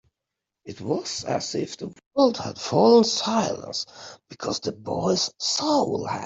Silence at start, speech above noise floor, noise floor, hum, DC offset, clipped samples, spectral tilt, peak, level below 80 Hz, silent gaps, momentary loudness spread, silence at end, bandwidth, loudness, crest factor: 0.65 s; 61 dB; -85 dBFS; none; under 0.1%; under 0.1%; -4 dB/octave; -4 dBFS; -64 dBFS; 2.06-2.11 s; 17 LU; 0 s; 8 kHz; -24 LUFS; 20 dB